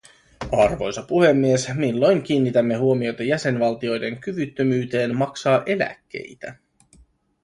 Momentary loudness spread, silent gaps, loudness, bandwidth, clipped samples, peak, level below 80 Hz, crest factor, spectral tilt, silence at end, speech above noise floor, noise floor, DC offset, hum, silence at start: 14 LU; none; -21 LUFS; 11.5 kHz; under 0.1%; -4 dBFS; -50 dBFS; 18 dB; -6 dB/octave; 0.9 s; 35 dB; -55 dBFS; under 0.1%; none; 0.4 s